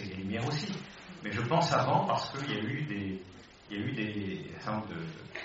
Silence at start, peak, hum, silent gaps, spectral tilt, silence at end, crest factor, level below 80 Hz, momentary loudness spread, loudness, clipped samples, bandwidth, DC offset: 0 s; -14 dBFS; none; none; -4.5 dB/octave; 0 s; 20 dB; -64 dBFS; 15 LU; -34 LUFS; under 0.1%; 8 kHz; under 0.1%